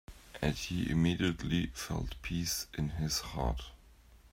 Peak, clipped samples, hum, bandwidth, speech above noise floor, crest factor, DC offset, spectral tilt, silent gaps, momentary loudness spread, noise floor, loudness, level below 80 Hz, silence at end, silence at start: -16 dBFS; under 0.1%; none; 16 kHz; 25 dB; 20 dB; under 0.1%; -4.5 dB/octave; none; 8 LU; -59 dBFS; -35 LUFS; -46 dBFS; 0.05 s; 0.1 s